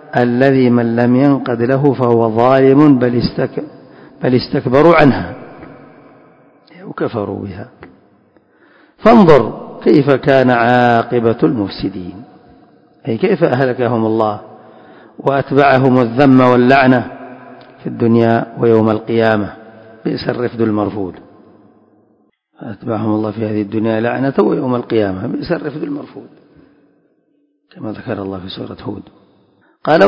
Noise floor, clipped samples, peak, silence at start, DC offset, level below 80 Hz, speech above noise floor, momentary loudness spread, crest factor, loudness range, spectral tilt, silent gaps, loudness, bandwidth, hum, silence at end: -60 dBFS; 0.5%; 0 dBFS; 0.15 s; under 0.1%; -46 dBFS; 47 dB; 18 LU; 14 dB; 14 LU; -9 dB/octave; none; -13 LUFS; 7 kHz; none; 0 s